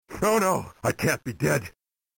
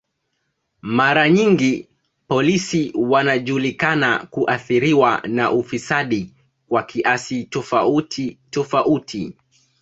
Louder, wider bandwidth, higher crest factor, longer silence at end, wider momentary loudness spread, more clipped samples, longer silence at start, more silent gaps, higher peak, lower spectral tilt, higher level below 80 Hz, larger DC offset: second, -25 LUFS vs -18 LUFS; first, 17 kHz vs 8 kHz; about the same, 16 dB vs 18 dB; about the same, 0.5 s vs 0.5 s; second, 6 LU vs 11 LU; neither; second, 0.1 s vs 0.85 s; neither; second, -12 dBFS vs -2 dBFS; about the same, -5 dB/octave vs -5.5 dB/octave; first, -52 dBFS vs -58 dBFS; neither